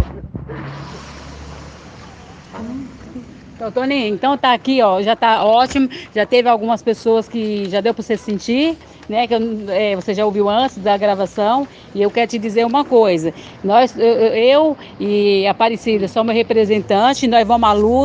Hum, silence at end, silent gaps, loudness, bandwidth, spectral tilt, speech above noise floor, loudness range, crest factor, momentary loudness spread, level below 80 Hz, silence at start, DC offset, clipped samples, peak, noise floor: none; 0 s; none; -16 LUFS; 9.2 kHz; -5.5 dB/octave; 23 dB; 7 LU; 16 dB; 18 LU; -46 dBFS; 0 s; under 0.1%; under 0.1%; 0 dBFS; -38 dBFS